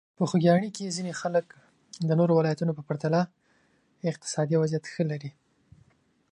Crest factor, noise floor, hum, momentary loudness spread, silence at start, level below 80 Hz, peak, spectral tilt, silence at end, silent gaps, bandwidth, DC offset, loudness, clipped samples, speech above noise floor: 20 dB; -66 dBFS; none; 11 LU; 0.2 s; -70 dBFS; -8 dBFS; -6.5 dB/octave; 1 s; none; 10.5 kHz; under 0.1%; -27 LUFS; under 0.1%; 40 dB